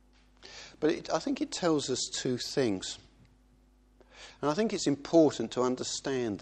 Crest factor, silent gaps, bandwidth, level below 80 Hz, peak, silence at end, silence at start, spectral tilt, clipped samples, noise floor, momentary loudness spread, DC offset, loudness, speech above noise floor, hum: 20 dB; none; 12 kHz; -62 dBFS; -12 dBFS; 0 s; 0.45 s; -4.5 dB/octave; under 0.1%; -63 dBFS; 20 LU; under 0.1%; -30 LUFS; 33 dB; none